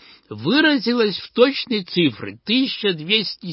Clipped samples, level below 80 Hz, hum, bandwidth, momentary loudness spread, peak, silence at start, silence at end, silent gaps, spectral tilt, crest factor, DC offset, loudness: under 0.1%; -62 dBFS; none; 5.8 kHz; 7 LU; -2 dBFS; 0.3 s; 0 s; none; -9 dB/octave; 18 dB; under 0.1%; -19 LUFS